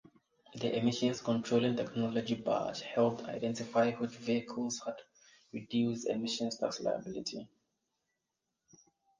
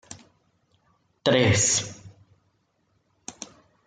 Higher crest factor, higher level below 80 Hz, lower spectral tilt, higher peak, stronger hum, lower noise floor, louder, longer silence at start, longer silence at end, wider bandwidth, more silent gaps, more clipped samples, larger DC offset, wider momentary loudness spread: about the same, 18 dB vs 22 dB; second, -74 dBFS vs -60 dBFS; first, -5 dB/octave vs -3.5 dB/octave; second, -16 dBFS vs -6 dBFS; neither; first, -87 dBFS vs -70 dBFS; second, -34 LUFS vs -21 LUFS; first, 0.5 s vs 0.1 s; first, 1.75 s vs 0.4 s; about the same, 9.6 kHz vs 9.8 kHz; neither; neither; neither; second, 10 LU vs 25 LU